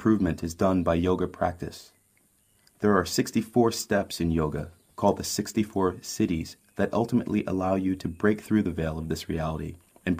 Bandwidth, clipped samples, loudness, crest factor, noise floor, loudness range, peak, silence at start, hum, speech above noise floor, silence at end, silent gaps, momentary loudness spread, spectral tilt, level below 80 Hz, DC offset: 15.5 kHz; under 0.1%; -27 LUFS; 20 dB; -65 dBFS; 1 LU; -8 dBFS; 0 s; none; 39 dB; 0 s; none; 8 LU; -5.5 dB/octave; -48 dBFS; under 0.1%